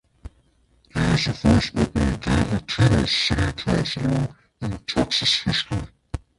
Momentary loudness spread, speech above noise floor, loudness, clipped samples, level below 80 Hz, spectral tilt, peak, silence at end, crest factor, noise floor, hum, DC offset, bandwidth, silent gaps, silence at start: 12 LU; 39 dB; -22 LUFS; under 0.1%; -34 dBFS; -5 dB/octave; -4 dBFS; 0.2 s; 18 dB; -60 dBFS; none; under 0.1%; 11.5 kHz; none; 0.25 s